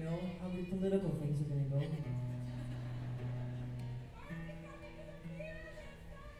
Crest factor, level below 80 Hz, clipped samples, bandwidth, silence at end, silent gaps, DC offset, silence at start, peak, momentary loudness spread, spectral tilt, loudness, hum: 20 dB; -54 dBFS; under 0.1%; 12.5 kHz; 0 s; none; under 0.1%; 0 s; -20 dBFS; 15 LU; -8.5 dB/octave; -41 LUFS; none